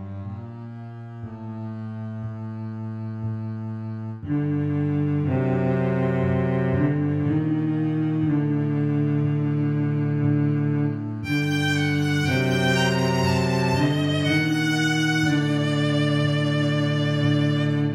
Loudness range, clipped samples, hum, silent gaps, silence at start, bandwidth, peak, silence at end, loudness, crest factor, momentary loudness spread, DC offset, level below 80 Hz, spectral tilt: 9 LU; under 0.1%; none; none; 0 s; 12.5 kHz; -10 dBFS; 0 s; -23 LUFS; 14 dB; 12 LU; under 0.1%; -54 dBFS; -6.5 dB/octave